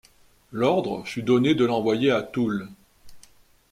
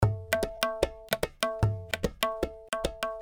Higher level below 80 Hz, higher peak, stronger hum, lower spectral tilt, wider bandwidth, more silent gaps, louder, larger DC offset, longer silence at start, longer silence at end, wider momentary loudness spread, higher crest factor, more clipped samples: second, -60 dBFS vs -44 dBFS; second, -8 dBFS vs -4 dBFS; neither; first, -6.5 dB/octave vs -4.5 dB/octave; second, 14.5 kHz vs over 20 kHz; neither; first, -23 LUFS vs -31 LUFS; neither; first, 0.5 s vs 0 s; first, 0.5 s vs 0 s; first, 11 LU vs 5 LU; second, 16 dB vs 26 dB; neither